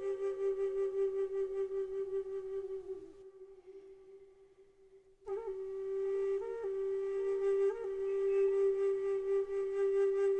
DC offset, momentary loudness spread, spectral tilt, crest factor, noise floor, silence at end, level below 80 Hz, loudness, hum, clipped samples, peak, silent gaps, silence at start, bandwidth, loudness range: under 0.1%; 22 LU; -6 dB/octave; 12 dB; -63 dBFS; 0 s; -66 dBFS; -35 LUFS; none; under 0.1%; -24 dBFS; none; 0 s; 8.2 kHz; 13 LU